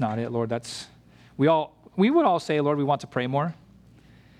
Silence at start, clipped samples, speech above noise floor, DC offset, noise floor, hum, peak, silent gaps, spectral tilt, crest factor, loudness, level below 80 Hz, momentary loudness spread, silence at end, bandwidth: 0 s; under 0.1%; 29 dB; under 0.1%; -53 dBFS; none; -8 dBFS; none; -6.5 dB/octave; 18 dB; -25 LUFS; -64 dBFS; 15 LU; 0.85 s; 12.5 kHz